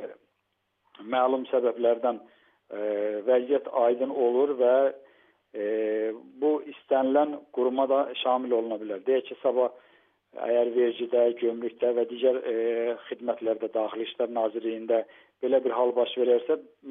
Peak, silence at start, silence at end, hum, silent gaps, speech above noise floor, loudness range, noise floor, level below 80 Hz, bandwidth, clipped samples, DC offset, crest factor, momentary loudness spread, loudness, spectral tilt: -12 dBFS; 0 s; 0 s; none; none; 51 dB; 2 LU; -77 dBFS; under -90 dBFS; 3.8 kHz; under 0.1%; under 0.1%; 16 dB; 8 LU; -27 LUFS; -2.5 dB/octave